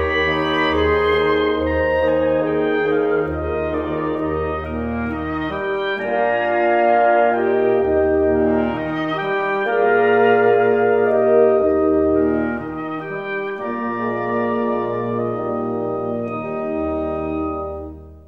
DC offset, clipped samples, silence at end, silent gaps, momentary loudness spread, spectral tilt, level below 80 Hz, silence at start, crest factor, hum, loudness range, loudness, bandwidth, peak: 0.2%; under 0.1%; 0.05 s; none; 10 LU; -8 dB/octave; -38 dBFS; 0 s; 14 dB; none; 6 LU; -19 LUFS; 5.8 kHz; -4 dBFS